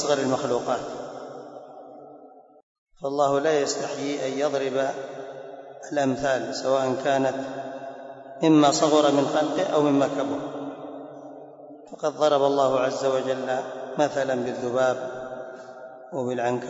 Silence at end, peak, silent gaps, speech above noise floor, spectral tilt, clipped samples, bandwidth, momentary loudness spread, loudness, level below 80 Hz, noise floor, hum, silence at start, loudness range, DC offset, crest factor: 0 s; -8 dBFS; 2.63-2.86 s; 25 dB; -4.5 dB/octave; under 0.1%; 8 kHz; 20 LU; -24 LUFS; -68 dBFS; -49 dBFS; none; 0 s; 6 LU; under 0.1%; 18 dB